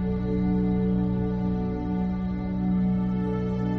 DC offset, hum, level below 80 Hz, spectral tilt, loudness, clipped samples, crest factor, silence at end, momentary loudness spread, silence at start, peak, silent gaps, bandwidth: under 0.1%; none; -36 dBFS; -11 dB/octave; -26 LUFS; under 0.1%; 12 dB; 0 s; 4 LU; 0 s; -14 dBFS; none; 4.6 kHz